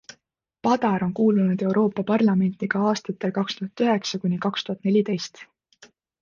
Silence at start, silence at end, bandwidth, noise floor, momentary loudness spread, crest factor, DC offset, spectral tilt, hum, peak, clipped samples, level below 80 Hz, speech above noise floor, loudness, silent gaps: 0.65 s; 0.35 s; 7.2 kHz; -71 dBFS; 7 LU; 16 dB; under 0.1%; -6.5 dB/octave; none; -8 dBFS; under 0.1%; -66 dBFS; 49 dB; -23 LUFS; none